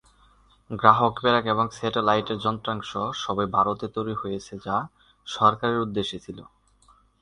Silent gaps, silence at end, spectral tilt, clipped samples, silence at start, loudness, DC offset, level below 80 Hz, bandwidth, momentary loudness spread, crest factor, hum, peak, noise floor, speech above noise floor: none; 0.8 s; -5.5 dB/octave; under 0.1%; 0.7 s; -24 LUFS; under 0.1%; -56 dBFS; 10.5 kHz; 16 LU; 24 dB; none; 0 dBFS; -59 dBFS; 35 dB